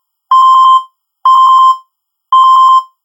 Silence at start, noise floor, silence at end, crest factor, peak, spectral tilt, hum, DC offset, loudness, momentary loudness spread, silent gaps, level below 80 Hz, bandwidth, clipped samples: 0.3 s; -60 dBFS; 0.2 s; 8 dB; 0 dBFS; 5.5 dB/octave; none; under 0.1%; -7 LUFS; 7 LU; none; -86 dBFS; 10 kHz; under 0.1%